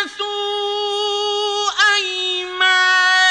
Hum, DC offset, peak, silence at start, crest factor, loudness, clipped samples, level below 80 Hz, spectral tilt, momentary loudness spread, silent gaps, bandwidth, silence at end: none; under 0.1%; -2 dBFS; 0 s; 16 dB; -16 LUFS; under 0.1%; -64 dBFS; 2 dB/octave; 9 LU; none; 10.5 kHz; 0 s